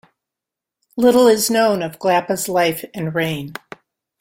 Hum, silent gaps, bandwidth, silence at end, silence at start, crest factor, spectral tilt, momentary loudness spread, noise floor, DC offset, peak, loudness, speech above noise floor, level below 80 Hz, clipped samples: none; none; 16.5 kHz; 0.7 s; 0.95 s; 16 dB; -4 dB/octave; 15 LU; -85 dBFS; under 0.1%; -2 dBFS; -17 LUFS; 69 dB; -58 dBFS; under 0.1%